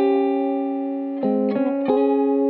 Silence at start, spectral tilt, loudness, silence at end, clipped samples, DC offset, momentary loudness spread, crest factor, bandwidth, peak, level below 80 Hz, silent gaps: 0 s; -11 dB/octave; -21 LUFS; 0 s; under 0.1%; under 0.1%; 6 LU; 12 dB; 4.5 kHz; -8 dBFS; -74 dBFS; none